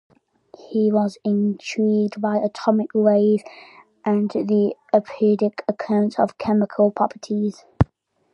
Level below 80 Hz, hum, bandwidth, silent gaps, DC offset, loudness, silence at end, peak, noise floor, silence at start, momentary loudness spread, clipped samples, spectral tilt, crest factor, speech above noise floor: -44 dBFS; none; 8.2 kHz; none; under 0.1%; -21 LUFS; 0.5 s; 0 dBFS; -54 dBFS; 0.7 s; 6 LU; under 0.1%; -8 dB/octave; 20 dB; 34 dB